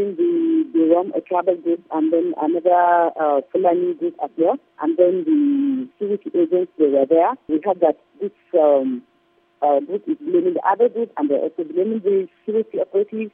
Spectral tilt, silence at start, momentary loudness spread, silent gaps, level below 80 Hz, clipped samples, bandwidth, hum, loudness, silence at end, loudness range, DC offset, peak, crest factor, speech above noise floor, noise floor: -10.5 dB/octave; 0 s; 8 LU; none; -76 dBFS; under 0.1%; 3.7 kHz; none; -19 LUFS; 0.05 s; 2 LU; under 0.1%; -2 dBFS; 16 dB; 42 dB; -60 dBFS